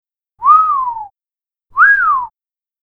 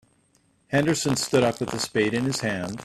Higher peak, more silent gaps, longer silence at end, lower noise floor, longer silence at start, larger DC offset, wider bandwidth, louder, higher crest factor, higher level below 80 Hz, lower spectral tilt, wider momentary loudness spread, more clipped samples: first, 0 dBFS vs -6 dBFS; neither; first, 0.55 s vs 0 s; first, under -90 dBFS vs -64 dBFS; second, 0.4 s vs 0.7 s; neither; second, 4.3 kHz vs 14.5 kHz; first, -11 LUFS vs -24 LUFS; about the same, 14 dB vs 18 dB; about the same, -54 dBFS vs -58 dBFS; second, -2.5 dB/octave vs -4.5 dB/octave; first, 16 LU vs 5 LU; neither